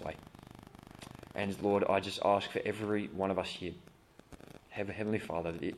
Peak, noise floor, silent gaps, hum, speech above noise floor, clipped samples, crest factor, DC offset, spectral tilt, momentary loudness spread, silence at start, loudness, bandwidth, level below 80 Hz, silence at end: -16 dBFS; -57 dBFS; none; none; 23 dB; under 0.1%; 20 dB; under 0.1%; -6 dB/octave; 23 LU; 0 s; -35 LUFS; 14 kHz; -64 dBFS; 0 s